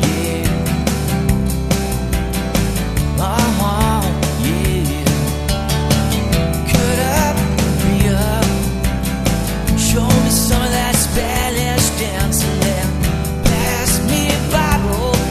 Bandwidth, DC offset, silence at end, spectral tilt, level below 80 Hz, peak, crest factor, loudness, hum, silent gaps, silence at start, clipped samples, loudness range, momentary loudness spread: 14 kHz; under 0.1%; 0 s; -4.5 dB/octave; -22 dBFS; 0 dBFS; 16 dB; -16 LUFS; none; none; 0 s; under 0.1%; 2 LU; 4 LU